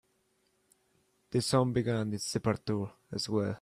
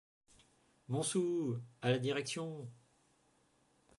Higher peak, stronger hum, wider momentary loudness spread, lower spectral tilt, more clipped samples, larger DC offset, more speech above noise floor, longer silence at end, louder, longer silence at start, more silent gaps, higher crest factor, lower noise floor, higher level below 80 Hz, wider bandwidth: first, -14 dBFS vs -20 dBFS; neither; second, 8 LU vs 11 LU; about the same, -5.5 dB/octave vs -5 dB/octave; neither; neither; first, 43 dB vs 36 dB; second, 0.05 s vs 1.25 s; first, -32 LUFS vs -37 LUFS; first, 1.3 s vs 0.9 s; neither; about the same, 20 dB vs 20 dB; about the same, -74 dBFS vs -73 dBFS; first, -64 dBFS vs -80 dBFS; first, 15 kHz vs 11.5 kHz